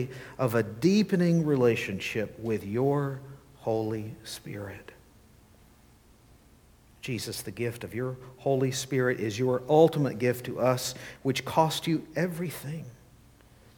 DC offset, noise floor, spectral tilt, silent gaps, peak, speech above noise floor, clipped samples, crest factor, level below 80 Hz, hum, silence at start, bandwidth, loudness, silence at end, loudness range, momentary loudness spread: under 0.1%; -58 dBFS; -6 dB/octave; none; -8 dBFS; 30 dB; under 0.1%; 22 dB; -62 dBFS; none; 0 s; 19 kHz; -28 LUFS; 0.85 s; 13 LU; 15 LU